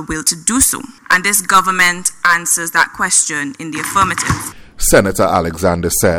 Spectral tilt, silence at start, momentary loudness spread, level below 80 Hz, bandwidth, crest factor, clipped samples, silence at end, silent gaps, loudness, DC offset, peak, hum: -2.5 dB/octave; 0 s; 8 LU; -32 dBFS; over 20 kHz; 14 dB; under 0.1%; 0 s; none; -13 LUFS; under 0.1%; 0 dBFS; none